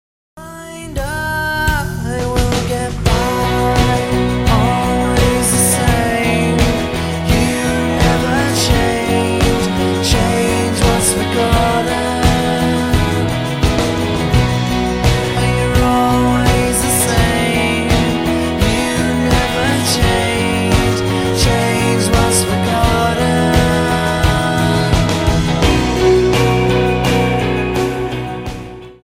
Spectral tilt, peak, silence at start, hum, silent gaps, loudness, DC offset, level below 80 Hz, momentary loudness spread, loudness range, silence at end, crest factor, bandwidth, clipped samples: -5 dB/octave; 0 dBFS; 0.35 s; none; none; -14 LUFS; under 0.1%; -24 dBFS; 5 LU; 2 LU; 0.1 s; 14 dB; 16 kHz; under 0.1%